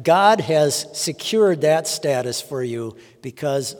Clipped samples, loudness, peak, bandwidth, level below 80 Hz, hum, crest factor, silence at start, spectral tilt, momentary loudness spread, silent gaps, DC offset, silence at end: under 0.1%; -20 LUFS; -2 dBFS; 18 kHz; -68 dBFS; none; 18 dB; 0 s; -4 dB/octave; 14 LU; none; under 0.1%; 0 s